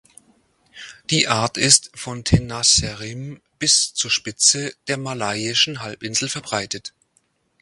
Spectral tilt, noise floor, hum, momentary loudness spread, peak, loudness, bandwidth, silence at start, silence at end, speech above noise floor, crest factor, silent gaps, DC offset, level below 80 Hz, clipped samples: -2 dB/octave; -65 dBFS; none; 17 LU; 0 dBFS; -18 LUFS; 11.5 kHz; 0.75 s; 0.75 s; 44 dB; 22 dB; none; under 0.1%; -42 dBFS; under 0.1%